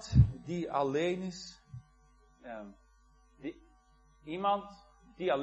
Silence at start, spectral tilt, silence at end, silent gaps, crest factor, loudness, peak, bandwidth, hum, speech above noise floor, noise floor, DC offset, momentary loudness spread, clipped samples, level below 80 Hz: 0 s; -7 dB/octave; 0 s; none; 24 dB; -34 LUFS; -10 dBFS; 8.4 kHz; none; 30 dB; -64 dBFS; under 0.1%; 23 LU; under 0.1%; -46 dBFS